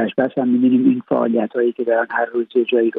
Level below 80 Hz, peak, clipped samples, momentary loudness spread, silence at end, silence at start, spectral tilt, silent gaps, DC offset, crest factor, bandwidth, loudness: -68 dBFS; -4 dBFS; under 0.1%; 5 LU; 0 s; 0 s; -10 dB/octave; none; under 0.1%; 12 dB; 4 kHz; -18 LUFS